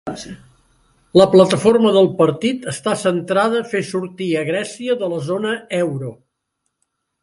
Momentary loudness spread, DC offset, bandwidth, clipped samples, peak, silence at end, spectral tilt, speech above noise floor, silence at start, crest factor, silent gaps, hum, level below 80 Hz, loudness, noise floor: 12 LU; under 0.1%; 11.5 kHz; under 0.1%; 0 dBFS; 1.1 s; -5.5 dB/octave; 57 dB; 0.05 s; 18 dB; none; none; -58 dBFS; -17 LUFS; -74 dBFS